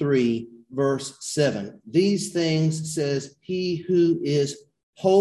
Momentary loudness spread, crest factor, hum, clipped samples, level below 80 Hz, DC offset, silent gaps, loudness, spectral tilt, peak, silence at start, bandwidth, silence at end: 9 LU; 16 dB; none; under 0.1%; -62 dBFS; under 0.1%; 4.83-4.93 s; -24 LUFS; -5.5 dB/octave; -8 dBFS; 0 s; 12.5 kHz; 0 s